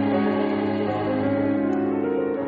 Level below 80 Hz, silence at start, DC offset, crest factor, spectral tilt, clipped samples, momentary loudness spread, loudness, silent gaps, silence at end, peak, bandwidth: -58 dBFS; 0 s; under 0.1%; 12 dB; -6.5 dB/octave; under 0.1%; 2 LU; -23 LUFS; none; 0 s; -10 dBFS; 4.9 kHz